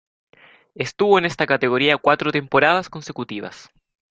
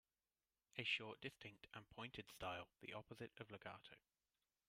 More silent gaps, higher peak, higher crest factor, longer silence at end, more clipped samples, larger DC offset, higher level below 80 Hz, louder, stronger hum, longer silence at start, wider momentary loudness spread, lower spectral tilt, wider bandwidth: neither; first, -2 dBFS vs -30 dBFS; second, 20 dB vs 26 dB; second, 0.55 s vs 0.7 s; neither; neither; first, -60 dBFS vs -80 dBFS; first, -18 LUFS vs -52 LUFS; neither; about the same, 0.8 s vs 0.75 s; about the same, 15 LU vs 16 LU; about the same, -5 dB/octave vs -4 dB/octave; second, 8.2 kHz vs 15.5 kHz